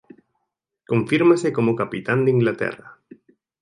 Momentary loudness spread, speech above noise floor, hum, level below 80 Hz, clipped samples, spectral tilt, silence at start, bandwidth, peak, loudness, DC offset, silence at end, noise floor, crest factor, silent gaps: 10 LU; 59 dB; none; -62 dBFS; under 0.1%; -7 dB/octave; 0.9 s; 11 kHz; -2 dBFS; -20 LUFS; under 0.1%; 0.7 s; -78 dBFS; 18 dB; none